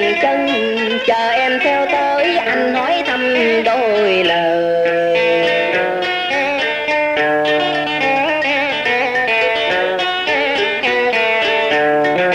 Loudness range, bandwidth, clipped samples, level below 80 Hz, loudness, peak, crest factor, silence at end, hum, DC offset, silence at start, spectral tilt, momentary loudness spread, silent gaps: 1 LU; 15.5 kHz; under 0.1%; -54 dBFS; -15 LUFS; -4 dBFS; 12 dB; 0 s; none; under 0.1%; 0 s; -4 dB/octave; 2 LU; none